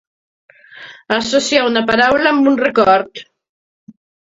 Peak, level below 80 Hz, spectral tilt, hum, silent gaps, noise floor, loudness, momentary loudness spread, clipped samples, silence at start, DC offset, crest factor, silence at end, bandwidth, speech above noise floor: 0 dBFS; -52 dBFS; -3.5 dB/octave; none; none; -38 dBFS; -13 LUFS; 20 LU; under 0.1%; 0.75 s; under 0.1%; 16 dB; 1.1 s; 8 kHz; 25 dB